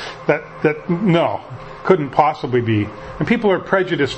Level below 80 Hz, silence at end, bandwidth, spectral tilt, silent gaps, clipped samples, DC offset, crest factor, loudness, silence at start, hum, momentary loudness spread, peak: -48 dBFS; 0 s; 8.4 kHz; -7.5 dB/octave; none; under 0.1%; under 0.1%; 18 dB; -18 LUFS; 0 s; none; 10 LU; 0 dBFS